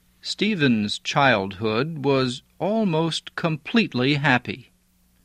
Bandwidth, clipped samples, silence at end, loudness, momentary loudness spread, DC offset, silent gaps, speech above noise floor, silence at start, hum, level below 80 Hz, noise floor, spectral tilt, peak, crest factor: 11.5 kHz; under 0.1%; 0.6 s; -22 LUFS; 8 LU; under 0.1%; none; 39 dB; 0.25 s; none; -58 dBFS; -61 dBFS; -5.5 dB/octave; -4 dBFS; 20 dB